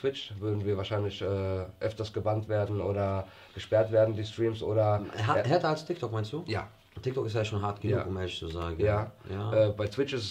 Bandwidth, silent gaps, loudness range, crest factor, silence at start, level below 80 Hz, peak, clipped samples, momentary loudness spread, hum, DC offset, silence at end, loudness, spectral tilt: 9.2 kHz; none; 4 LU; 18 dB; 0 s; -54 dBFS; -12 dBFS; under 0.1%; 9 LU; none; under 0.1%; 0 s; -31 LUFS; -7 dB/octave